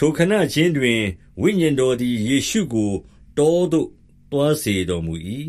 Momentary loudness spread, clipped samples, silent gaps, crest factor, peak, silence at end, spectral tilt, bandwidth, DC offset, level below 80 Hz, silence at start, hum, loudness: 9 LU; under 0.1%; none; 16 dB; -2 dBFS; 0 s; -5.5 dB/octave; 15.5 kHz; under 0.1%; -46 dBFS; 0 s; none; -20 LUFS